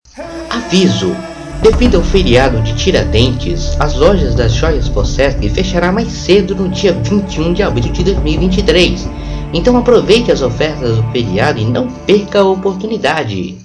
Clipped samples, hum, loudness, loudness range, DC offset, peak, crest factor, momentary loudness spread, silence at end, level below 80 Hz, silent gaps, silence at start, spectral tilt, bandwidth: under 0.1%; none; -12 LUFS; 2 LU; under 0.1%; 0 dBFS; 12 dB; 8 LU; 0 s; -20 dBFS; none; 0.15 s; -6 dB/octave; 10.5 kHz